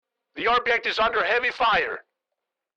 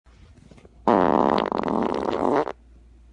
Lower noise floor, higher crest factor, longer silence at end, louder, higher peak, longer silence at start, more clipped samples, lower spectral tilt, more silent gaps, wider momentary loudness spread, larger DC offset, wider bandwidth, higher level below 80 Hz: first, -84 dBFS vs -50 dBFS; second, 12 dB vs 20 dB; first, 0.75 s vs 0.6 s; about the same, -22 LUFS vs -23 LUFS; second, -12 dBFS vs -4 dBFS; second, 0.35 s vs 0.85 s; neither; second, -3 dB/octave vs -7 dB/octave; neither; about the same, 10 LU vs 9 LU; neither; second, 8.4 kHz vs 10 kHz; about the same, -54 dBFS vs -50 dBFS